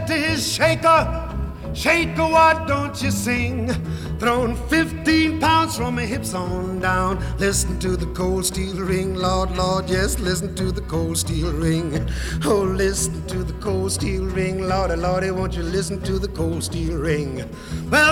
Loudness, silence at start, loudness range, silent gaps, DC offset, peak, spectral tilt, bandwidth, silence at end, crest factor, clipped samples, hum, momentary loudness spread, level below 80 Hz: -21 LUFS; 0 s; 4 LU; none; under 0.1%; -6 dBFS; -4.5 dB/octave; 17.5 kHz; 0 s; 16 dB; under 0.1%; none; 8 LU; -30 dBFS